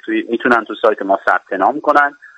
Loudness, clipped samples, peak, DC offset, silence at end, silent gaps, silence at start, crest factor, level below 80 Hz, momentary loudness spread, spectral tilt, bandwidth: -15 LUFS; under 0.1%; 0 dBFS; under 0.1%; 0.1 s; none; 0.05 s; 16 dB; -60 dBFS; 4 LU; -5.5 dB/octave; 10.5 kHz